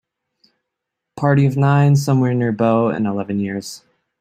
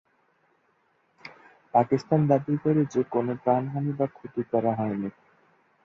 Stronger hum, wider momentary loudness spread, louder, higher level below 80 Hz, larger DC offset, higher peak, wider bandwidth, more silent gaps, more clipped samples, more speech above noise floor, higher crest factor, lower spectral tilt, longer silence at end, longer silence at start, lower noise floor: neither; about the same, 11 LU vs 13 LU; first, -17 LUFS vs -26 LUFS; first, -56 dBFS vs -66 dBFS; neither; first, -2 dBFS vs -6 dBFS; first, 14 kHz vs 7.4 kHz; neither; neither; first, 64 dB vs 43 dB; about the same, 16 dB vs 20 dB; second, -7.5 dB/octave vs -9 dB/octave; second, 0.45 s vs 0.75 s; about the same, 1.15 s vs 1.25 s; first, -80 dBFS vs -68 dBFS